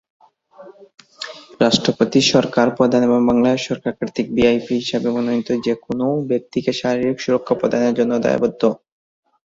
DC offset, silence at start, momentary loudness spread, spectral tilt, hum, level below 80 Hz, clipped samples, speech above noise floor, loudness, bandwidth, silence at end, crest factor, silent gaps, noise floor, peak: under 0.1%; 0.6 s; 9 LU; -5 dB/octave; none; -52 dBFS; under 0.1%; 26 dB; -18 LUFS; 7.8 kHz; 0.7 s; 18 dB; none; -44 dBFS; -2 dBFS